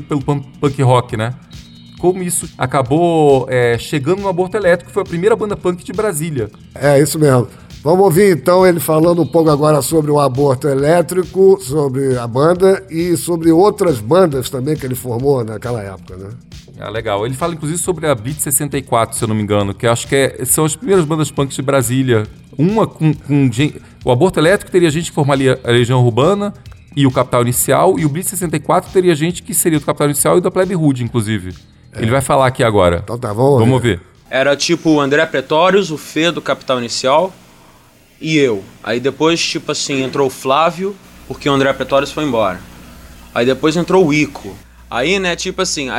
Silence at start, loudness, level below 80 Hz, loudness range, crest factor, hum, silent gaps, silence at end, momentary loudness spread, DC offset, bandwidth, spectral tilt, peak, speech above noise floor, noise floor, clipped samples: 0 s; -14 LUFS; -42 dBFS; 5 LU; 14 dB; none; none; 0 s; 9 LU; under 0.1%; 16.5 kHz; -5 dB/octave; 0 dBFS; 32 dB; -46 dBFS; under 0.1%